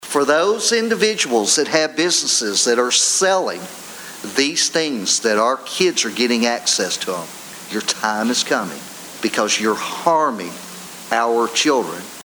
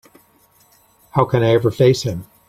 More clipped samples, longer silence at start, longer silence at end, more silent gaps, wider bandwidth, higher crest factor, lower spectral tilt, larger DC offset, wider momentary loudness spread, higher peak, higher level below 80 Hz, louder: neither; second, 0 s vs 1.15 s; second, 0 s vs 0.25 s; neither; first, over 20 kHz vs 15 kHz; about the same, 18 dB vs 18 dB; second, -1.5 dB/octave vs -6.5 dB/octave; neither; first, 15 LU vs 8 LU; about the same, 0 dBFS vs 0 dBFS; second, -66 dBFS vs -50 dBFS; about the same, -17 LUFS vs -17 LUFS